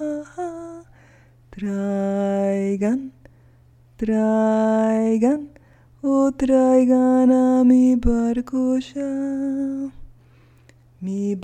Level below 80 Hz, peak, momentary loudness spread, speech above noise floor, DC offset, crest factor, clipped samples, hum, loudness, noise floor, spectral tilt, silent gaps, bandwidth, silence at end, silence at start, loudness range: -40 dBFS; -6 dBFS; 15 LU; 34 dB; under 0.1%; 16 dB; under 0.1%; none; -20 LUFS; -52 dBFS; -7.5 dB/octave; none; 9.4 kHz; 0 s; 0 s; 8 LU